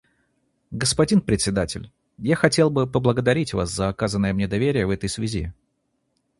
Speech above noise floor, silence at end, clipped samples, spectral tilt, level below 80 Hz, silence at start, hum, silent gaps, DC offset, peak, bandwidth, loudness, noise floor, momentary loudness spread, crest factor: 51 dB; 0.9 s; under 0.1%; -5 dB/octave; -42 dBFS; 0.7 s; none; none; under 0.1%; 0 dBFS; 11.5 kHz; -22 LUFS; -72 dBFS; 11 LU; 22 dB